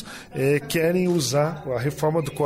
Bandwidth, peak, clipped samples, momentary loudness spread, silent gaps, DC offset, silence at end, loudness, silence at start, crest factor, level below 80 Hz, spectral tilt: 16 kHz; -10 dBFS; under 0.1%; 6 LU; none; under 0.1%; 0 s; -23 LUFS; 0 s; 12 dB; -54 dBFS; -5.5 dB/octave